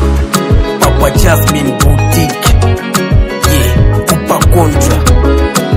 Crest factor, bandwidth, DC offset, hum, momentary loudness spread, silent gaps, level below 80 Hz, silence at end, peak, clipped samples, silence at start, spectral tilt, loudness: 8 dB; over 20 kHz; under 0.1%; none; 3 LU; none; -12 dBFS; 0 s; 0 dBFS; 2%; 0 s; -5 dB/octave; -10 LUFS